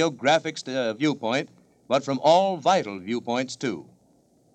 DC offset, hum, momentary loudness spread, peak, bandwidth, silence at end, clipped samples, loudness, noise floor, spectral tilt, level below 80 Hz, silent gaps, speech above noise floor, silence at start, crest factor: under 0.1%; none; 11 LU; -8 dBFS; 9.2 kHz; 0.7 s; under 0.1%; -24 LUFS; -61 dBFS; -4.5 dB/octave; -76 dBFS; none; 37 dB; 0 s; 18 dB